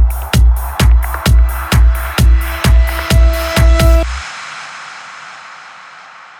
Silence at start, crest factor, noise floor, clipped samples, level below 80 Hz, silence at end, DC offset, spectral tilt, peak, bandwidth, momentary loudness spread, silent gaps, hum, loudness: 0 s; 12 dB; -36 dBFS; under 0.1%; -12 dBFS; 0.55 s; under 0.1%; -5 dB/octave; 0 dBFS; 17 kHz; 19 LU; none; none; -12 LUFS